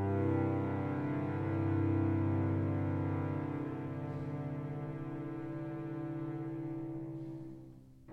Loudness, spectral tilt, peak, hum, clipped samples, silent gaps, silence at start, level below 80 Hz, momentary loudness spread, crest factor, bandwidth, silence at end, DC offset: -37 LUFS; -10.5 dB/octave; -22 dBFS; none; under 0.1%; none; 0 s; -64 dBFS; 10 LU; 14 dB; 4.4 kHz; 0 s; under 0.1%